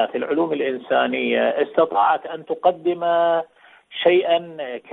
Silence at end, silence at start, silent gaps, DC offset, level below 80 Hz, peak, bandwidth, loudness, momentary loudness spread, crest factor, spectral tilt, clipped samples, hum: 0 s; 0 s; none; under 0.1%; -68 dBFS; -4 dBFS; 4.1 kHz; -20 LUFS; 9 LU; 18 dB; -8 dB/octave; under 0.1%; none